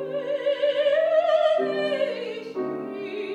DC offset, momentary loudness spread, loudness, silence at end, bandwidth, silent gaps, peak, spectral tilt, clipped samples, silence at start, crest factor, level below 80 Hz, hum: under 0.1%; 11 LU; -24 LUFS; 0 s; 8.2 kHz; none; -10 dBFS; -5 dB/octave; under 0.1%; 0 s; 14 dB; -86 dBFS; none